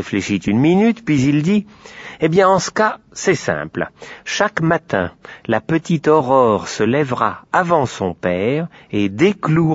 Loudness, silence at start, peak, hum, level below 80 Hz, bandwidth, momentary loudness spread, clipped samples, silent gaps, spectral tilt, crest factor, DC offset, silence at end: -17 LUFS; 0 s; -2 dBFS; none; -50 dBFS; 8 kHz; 10 LU; under 0.1%; none; -6 dB/octave; 16 dB; under 0.1%; 0 s